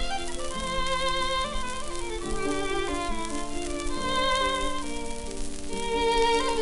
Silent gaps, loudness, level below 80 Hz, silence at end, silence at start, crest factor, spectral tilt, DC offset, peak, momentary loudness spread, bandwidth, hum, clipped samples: none; -29 LUFS; -36 dBFS; 0 s; 0 s; 18 dB; -3 dB/octave; under 0.1%; -8 dBFS; 10 LU; 11.5 kHz; none; under 0.1%